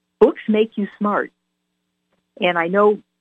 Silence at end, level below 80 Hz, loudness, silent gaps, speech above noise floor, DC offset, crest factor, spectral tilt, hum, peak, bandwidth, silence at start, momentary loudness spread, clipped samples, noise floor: 0.25 s; -60 dBFS; -19 LUFS; none; 56 dB; under 0.1%; 18 dB; -8 dB/octave; none; -2 dBFS; 4 kHz; 0.2 s; 7 LU; under 0.1%; -74 dBFS